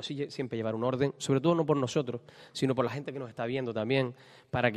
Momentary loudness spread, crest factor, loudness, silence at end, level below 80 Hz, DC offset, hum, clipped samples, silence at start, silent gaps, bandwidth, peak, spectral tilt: 11 LU; 22 dB; -31 LUFS; 0 s; -68 dBFS; under 0.1%; none; under 0.1%; 0 s; none; 13 kHz; -10 dBFS; -6 dB/octave